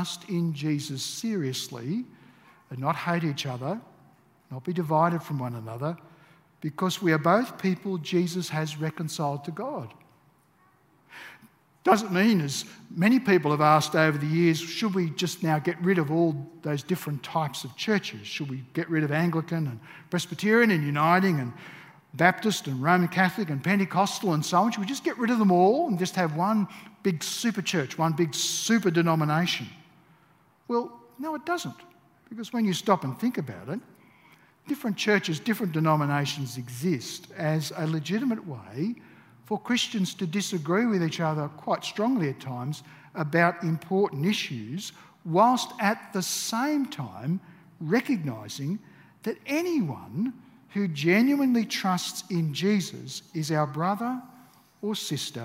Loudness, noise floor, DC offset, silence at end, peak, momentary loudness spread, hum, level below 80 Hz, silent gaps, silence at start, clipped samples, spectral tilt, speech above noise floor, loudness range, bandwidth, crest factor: -27 LUFS; -63 dBFS; under 0.1%; 0 s; -4 dBFS; 13 LU; none; -74 dBFS; none; 0 s; under 0.1%; -5 dB/octave; 36 dB; 7 LU; 16 kHz; 24 dB